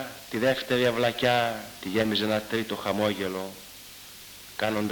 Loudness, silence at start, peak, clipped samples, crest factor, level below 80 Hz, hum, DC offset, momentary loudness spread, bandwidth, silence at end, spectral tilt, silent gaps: -27 LUFS; 0 s; -10 dBFS; under 0.1%; 18 dB; -60 dBFS; none; under 0.1%; 19 LU; 19 kHz; 0 s; -4.5 dB/octave; none